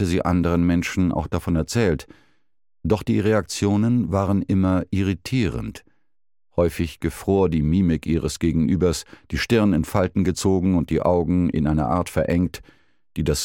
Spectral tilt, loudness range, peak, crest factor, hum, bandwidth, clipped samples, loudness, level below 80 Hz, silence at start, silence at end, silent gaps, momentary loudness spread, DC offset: -6.5 dB/octave; 3 LU; -6 dBFS; 16 dB; none; 17 kHz; under 0.1%; -22 LUFS; -38 dBFS; 0 s; 0 s; none; 7 LU; 0.1%